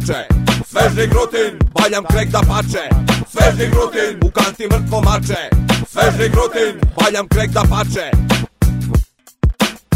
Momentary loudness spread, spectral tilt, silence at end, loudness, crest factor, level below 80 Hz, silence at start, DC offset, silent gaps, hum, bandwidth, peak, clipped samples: 4 LU; -5.5 dB/octave; 0 s; -15 LUFS; 14 dB; -20 dBFS; 0 s; under 0.1%; none; none; 16.5 kHz; 0 dBFS; under 0.1%